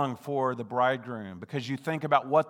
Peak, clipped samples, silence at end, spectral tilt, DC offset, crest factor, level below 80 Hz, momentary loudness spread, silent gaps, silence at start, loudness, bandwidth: -8 dBFS; under 0.1%; 0 s; -6.5 dB/octave; under 0.1%; 20 dB; -80 dBFS; 10 LU; none; 0 s; -30 LUFS; 15.5 kHz